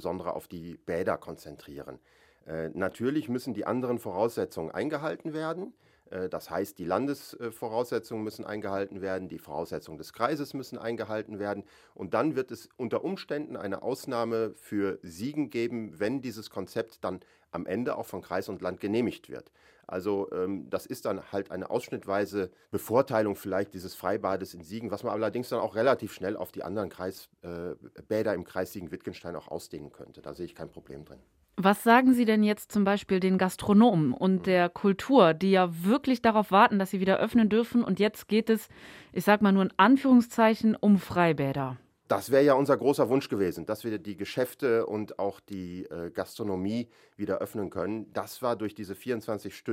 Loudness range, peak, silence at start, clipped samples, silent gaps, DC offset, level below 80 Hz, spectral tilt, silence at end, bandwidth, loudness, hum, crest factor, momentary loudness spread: 11 LU; -6 dBFS; 0 s; under 0.1%; none; under 0.1%; -64 dBFS; -6.5 dB/octave; 0 s; 16 kHz; -29 LUFS; none; 22 dB; 17 LU